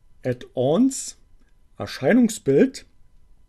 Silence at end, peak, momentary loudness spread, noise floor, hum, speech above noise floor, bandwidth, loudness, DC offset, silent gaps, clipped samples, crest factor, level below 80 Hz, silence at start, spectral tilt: 0.7 s; -4 dBFS; 16 LU; -52 dBFS; none; 32 dB; 13 kHz; -21 LUFS; under 0.1%; none; under 0.1%; 18 dB; -54 dBFS; 0.25 s; -5.5 dB/octave